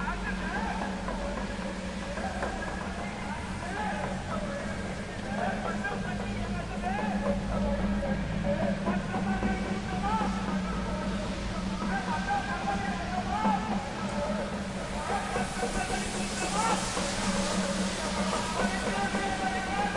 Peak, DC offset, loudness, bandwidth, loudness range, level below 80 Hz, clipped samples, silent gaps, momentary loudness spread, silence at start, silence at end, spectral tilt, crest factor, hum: -16 dBFS; under 0.1%; -31 LUFS; 11.5 kHz; 5 LU; -42 dBFS; under 0.1%; none; 6 LU; 0 s; 0 s; -4.5 dB/octave; 16 dB; none